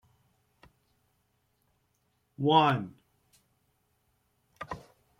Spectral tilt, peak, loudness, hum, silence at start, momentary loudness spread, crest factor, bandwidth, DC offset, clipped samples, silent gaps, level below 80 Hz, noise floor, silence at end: -7 dB/octave; -10 dBFS; -26 LUFS; none; 2.4 s; 22 LU; 24 dB; 15.5 kHz; under 0.1%; under 0.1%; none; -68 dBFS; -75 dBFS; 0.4 s